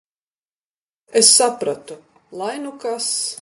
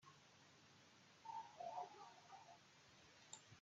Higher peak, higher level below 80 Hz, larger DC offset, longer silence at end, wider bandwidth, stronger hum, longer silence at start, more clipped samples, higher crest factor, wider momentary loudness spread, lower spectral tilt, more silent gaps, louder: first, 0 dBFS vs -38 dBFS; first, -72 dBFS vs under -90 dBFS; neither; about the same, 0.05 s vs 0 s; first, 12 kHz vs 7.6 kHz; neither; first, 1.1 s vs 0 s; neither; about the same, 22 dB vs 20 dB; about the same, 17 LU vs 15 LU; second, -0.5 dB/octave vs -2 dB/octave; neither; first, -16 LUFS vs -59 LUFS